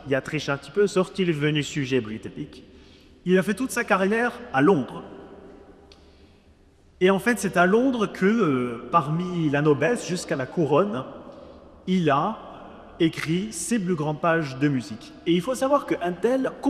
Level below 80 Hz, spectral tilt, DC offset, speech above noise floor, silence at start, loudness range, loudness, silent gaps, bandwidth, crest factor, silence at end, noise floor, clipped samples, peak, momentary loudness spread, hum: -56 dBFS; -5.5 dB/octave; under 0.1%; 32 dB; 0 s; 4 LU; -23 LUFS; none; 14 kHz; 18 dB; 0 s; -55 dBFS; under 0.1%; -6 dBFS; 16 LU; none